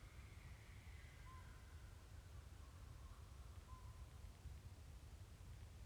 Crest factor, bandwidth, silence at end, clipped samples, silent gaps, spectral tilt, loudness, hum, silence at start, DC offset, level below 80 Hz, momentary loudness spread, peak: 14 dB; 19.5 kHz; 0 s; under 0.1%; none; -5 dB/octave; -61 LUFS; none; 0 s; under 0.1%; -60 dBFS; 2 LU; -44 dBFS